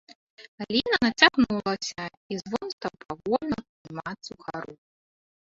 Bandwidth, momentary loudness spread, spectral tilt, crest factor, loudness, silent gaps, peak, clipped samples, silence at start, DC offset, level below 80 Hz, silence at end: 7.8 kHz; 19 LU; -3.5 dB/octave; 26 dB; -26 LUFS; 0.15-0.37 s, 0.48-0.58 s, 2.17-2.29 s, 2.73-2.78 s, 3.69-3.85 s; -2 dBFS; under 0.1%; 0.1 s; under 0.1%; -58 dBFS; 0.85 s